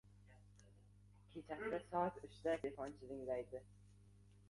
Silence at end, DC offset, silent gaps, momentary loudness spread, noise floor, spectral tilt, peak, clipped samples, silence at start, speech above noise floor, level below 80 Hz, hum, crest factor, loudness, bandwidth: 0.05 s; under 0.1%; none; 25 LU; -66 dBFS; -6.5 dB/octave; -26 dBFS; under 0.1%; 0.05 s; 21 dB; -70 dBFS; 50 Hz at -65 dBFS; 22 dB; -46 LUFS; 11.5 kHz